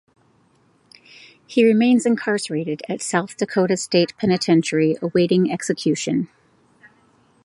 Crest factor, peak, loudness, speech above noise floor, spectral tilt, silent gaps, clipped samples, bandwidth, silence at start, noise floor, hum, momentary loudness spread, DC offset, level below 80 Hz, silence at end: 18 dB; -2 dBFS; -20 LUFS; 40 dB; -5 dB/octave; none; under 0.1%; 11.5 kHz; 1.5 s; -59 dBFS; none; 9 LU; under 0.1%; -64 dBFS; 1.2 s